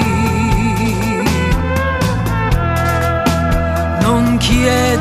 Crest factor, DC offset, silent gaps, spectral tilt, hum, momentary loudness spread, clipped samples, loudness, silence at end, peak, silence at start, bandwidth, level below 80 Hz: 14 dB; under 0.1%; none; -5.5 dB/octave; none; 3 LU; under 0.1%; -15 LUFS; 0 s; 0 dBFS; 0 s; 14 kHz; -22 dBFS